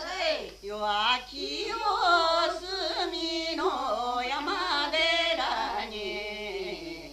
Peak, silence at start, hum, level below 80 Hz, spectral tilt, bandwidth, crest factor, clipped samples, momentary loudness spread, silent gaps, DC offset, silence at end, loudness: -12 dBFS; 0 s; none; -54 dBFS; -2 dB/octave; 14.5 kHz; 18 dB; under 0.1%; 11 LU; none; under 0.1%; 0 s; -28 LUFS